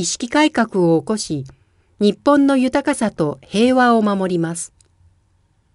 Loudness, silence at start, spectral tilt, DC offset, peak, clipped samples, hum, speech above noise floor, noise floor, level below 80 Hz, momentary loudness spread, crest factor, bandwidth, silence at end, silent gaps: -17 LUFS; 0 s; -5 dB/octave; under 0.1%; -2 dBFS; under 0.1%; none; 43 dB; -60 dBFS; -54 dBFS; 11 LU; 16 dB; 11.5 kHz; 1.1 s; none